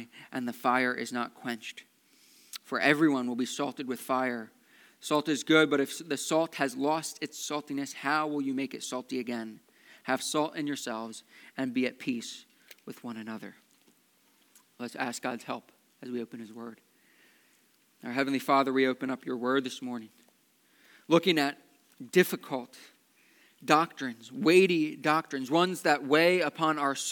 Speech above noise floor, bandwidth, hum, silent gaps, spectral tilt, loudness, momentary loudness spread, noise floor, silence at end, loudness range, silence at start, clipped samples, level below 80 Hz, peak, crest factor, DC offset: 37 dB; 19 kHz; none; none; -4 dB/octave; -29 LUFS; 19 LU; -67 dBFS; 0 s; 12 LU; 0 s; under 0.1%; under -90 dBFS; -6 dBFS; 26 dB; under 0.1%